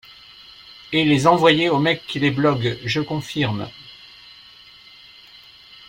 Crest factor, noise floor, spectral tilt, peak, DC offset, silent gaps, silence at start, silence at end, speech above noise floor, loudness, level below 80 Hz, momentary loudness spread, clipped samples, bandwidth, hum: 20 dB; -46 dBFS; -5.5 dB/octave; -2 dBFS; under 0.1%; none; 0.85 s; 1.95 s; 27 dB; -19 LUFS; -56 dBFS; 26 LU; under 0.1%; 16 kHz; none